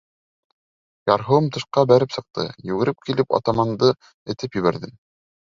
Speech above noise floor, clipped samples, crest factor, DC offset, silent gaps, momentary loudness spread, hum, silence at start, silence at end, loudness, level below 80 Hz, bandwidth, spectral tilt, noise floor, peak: over 70 dB; under 0.1%; 20 dB; under 0.1%; 4.14-4.26 s; 13 LU; none; 1.05 s; 0.6 s; -21 LUFS; -56 dBFS; 7.6 kHz; -7 dB/octave; under -90 dBFS; -2 dBFS